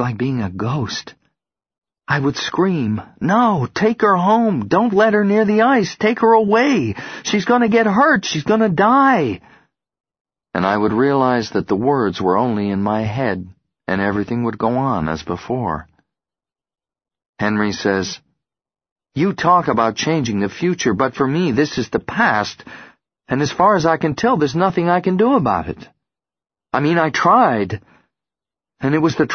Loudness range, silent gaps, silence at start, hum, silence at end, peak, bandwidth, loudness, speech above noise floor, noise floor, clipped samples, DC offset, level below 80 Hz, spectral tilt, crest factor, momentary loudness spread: 7 LU; 1.78-1.82 s, 10.21-10.25 s, 17.29-17.33 s, 18.92-18.96 s; 0 s; none; 0 s; -2 dBFS; 6.6 kHz; -17 LUFS; over 74 dB; under -90 dBFS; under 0.1%; under 0.1%; -50 dBFS; -6 dB/octave; 16 dB; 10 LU